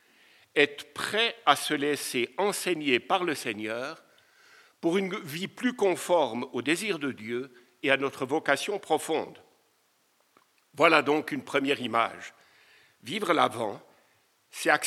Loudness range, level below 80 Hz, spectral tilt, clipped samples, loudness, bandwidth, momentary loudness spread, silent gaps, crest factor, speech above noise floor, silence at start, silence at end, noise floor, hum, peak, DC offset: 4 LU; -84 dBFS; -3.5 dB/octave; under 0.1%; -28 LUFS; 16 kHz; 11 LU; none; 26 dB; 41 dB; 0.55 s; 0 s; -69 dBFS; none; -4 dBFS; under 0.1%